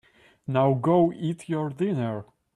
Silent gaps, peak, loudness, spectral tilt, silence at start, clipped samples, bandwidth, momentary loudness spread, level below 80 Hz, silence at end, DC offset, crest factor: none; -10 dBFS; -25 LUFS; -8.5 dB/octave; 0.5 s; under 0.1%; 11.5 kHz; 11 LU; -64 dBFS; 0.3 s; under 0.1%; 16 dB